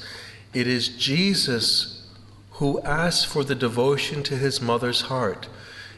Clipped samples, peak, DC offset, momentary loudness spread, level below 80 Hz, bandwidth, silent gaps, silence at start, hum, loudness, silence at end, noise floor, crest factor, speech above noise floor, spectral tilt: under 0.1%; -10 dBFS; under 0.1%; 15 LU; -50 dBFS; 12.5 kHz; none; 0 s; none; -23 LUFS; 0 s; -46 dBFS; 16 dB; 23 dB; -4 dB/octave